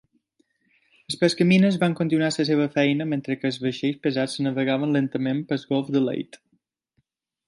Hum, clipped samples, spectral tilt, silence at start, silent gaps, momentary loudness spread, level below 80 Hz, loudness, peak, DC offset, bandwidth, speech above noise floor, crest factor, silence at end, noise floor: none; under 0.1%; -6 dB/octave; 1.1 s; none; 9 LU; -68 dBFS; -23 LUFS; -6 dBFS; under 0.1%; 11.5 kHz; 50 dB; 18 dB; 1.25 s; -72 dBFS